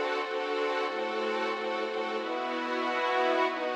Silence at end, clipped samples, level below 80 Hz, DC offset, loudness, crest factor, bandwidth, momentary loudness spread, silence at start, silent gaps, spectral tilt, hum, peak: 0 s; under 0.1%; under -90 dBFS; under 0.1%; -30 LUFS; 14 dB; 11 kHz; 5 LU; 0 s; none; -3 dB/octave; none; -16 dBFS